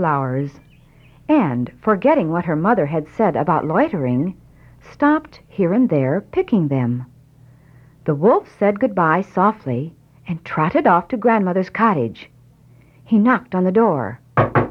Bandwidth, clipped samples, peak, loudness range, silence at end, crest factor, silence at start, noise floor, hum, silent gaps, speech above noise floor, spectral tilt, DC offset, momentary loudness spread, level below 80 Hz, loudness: 6.4 kHz; under 0.1%; -2 dBFS; 2 LU; 0 s; 18 dB; 0 s; -49 dBFS; none; none; 31 dB; -10 dB/octave; under 0.1%; 10 LU; -52 dBFS; -18 LUFS